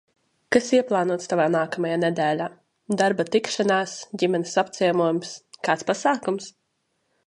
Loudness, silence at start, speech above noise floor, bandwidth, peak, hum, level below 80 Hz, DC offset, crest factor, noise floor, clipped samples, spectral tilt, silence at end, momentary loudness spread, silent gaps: -23 LUFS; 0.5 s; 50 dB; 11.5 kHz; -2 dBFS; none; -70 dBFS; under 0.1%; 20 dB; -73 dBFS; under 0.1%; -4.5 dB/octave; 0.75 s; 9 LU; none